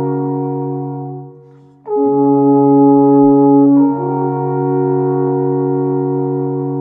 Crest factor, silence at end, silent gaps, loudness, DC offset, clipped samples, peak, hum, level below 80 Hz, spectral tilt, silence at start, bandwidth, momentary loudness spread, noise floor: 12 dB; 0 s; none; -13 LUFS; under 0.1%; under 0.1%; 0 dBFS; none; -66 dBFS; -15 dB/octave; 0 s; 2 kHz; 12 LU; -42 dBFS